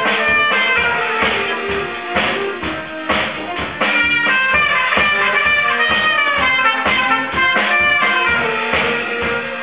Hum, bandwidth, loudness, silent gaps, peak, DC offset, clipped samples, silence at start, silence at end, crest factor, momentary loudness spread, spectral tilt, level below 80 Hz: none; 4 kHz; -14 LUFS; none; 0 dBFS; 0.4%; under 0.1%; 0 s; 0 s; 16 dB; 8 LU; -6.5 dB/octave; -42 dBFS